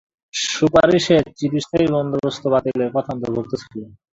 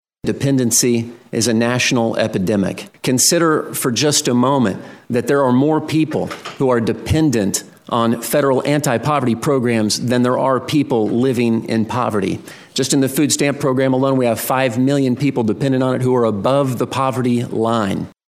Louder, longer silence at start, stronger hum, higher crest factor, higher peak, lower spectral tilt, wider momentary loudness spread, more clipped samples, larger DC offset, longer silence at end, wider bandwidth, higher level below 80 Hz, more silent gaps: about the same, -19 LUFS vs -17 LUFS; about the same, 0.35 s vs 0.25 s; neither; about the same, 18 dB vs 16 dB; about the same, -2 dBFS vs 0 dBFS; about the same, -5 dB/octave vs -4.5 dB/octave; first, 14 LU vs 7 LU; neither; neither; about the same, 0.25 s vs 0.2 s; second, 8 kHz vs 16 kHz; about the same, -48 dBFS vs -52 dBFS; neither